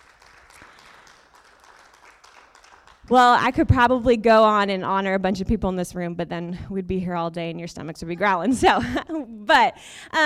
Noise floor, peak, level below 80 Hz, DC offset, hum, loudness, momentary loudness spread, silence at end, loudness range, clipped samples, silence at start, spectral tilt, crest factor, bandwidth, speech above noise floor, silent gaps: -53 dBFS; -6 dBFS; -42 dBFS; under 0.1%; none; -20 LUFS; 15 LU; 0 s; 7 LU; under 0.1%; 3.1 s; -5.5 dB/octave; 16 dB; 15 kHz; 32 dB; none